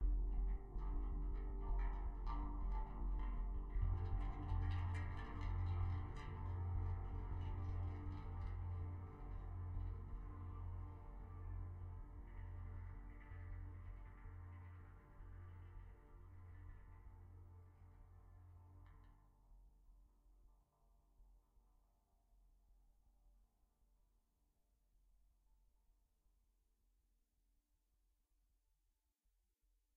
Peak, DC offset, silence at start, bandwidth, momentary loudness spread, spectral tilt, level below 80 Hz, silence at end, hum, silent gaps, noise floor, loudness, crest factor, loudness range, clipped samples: -28 dBFS; under 0.1%; 0 s; 4.3 kHz; 19 LU; -8 dB/octave; -50 dBFS; 6.65 s; none; none; -85 dBFS; -49 LUFS; 18 dB; 18 LU; under 0.1%